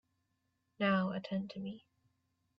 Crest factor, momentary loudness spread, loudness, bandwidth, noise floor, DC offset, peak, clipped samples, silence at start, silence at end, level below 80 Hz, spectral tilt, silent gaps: 18 dB; 14 LU; -36 LUFS; 5.8 kHz; -82 dBFS; under 0.1%; -22 dBFS; under 0.1%; 0.8 s; 0.8 s; -78 dBFS; -5 dB/octave; none